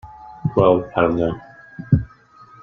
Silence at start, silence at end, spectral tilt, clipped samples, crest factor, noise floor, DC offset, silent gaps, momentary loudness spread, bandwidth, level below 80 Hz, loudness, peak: 0.05 s; 0.55 s; -10 dB/octave; under 0.1%; 18 dB; -47 dBFS; under 0.1%; none; 22 LU; 6.4 kHz; -42 dBFS; -19 LUFS; -2 dBFS